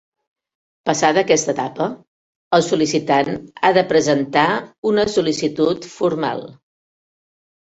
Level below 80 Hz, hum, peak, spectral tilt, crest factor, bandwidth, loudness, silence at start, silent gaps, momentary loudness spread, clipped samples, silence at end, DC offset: -56 dBFS; none; 0 dBFS; -4 dB/octave; 18 dB; 8.2 kHz; -18 LUFS; 0.85 s; 2.07-2.51 s, 4.78-4.83 s; 8 LU; under 0.1%; 1.15 s; under 0.1%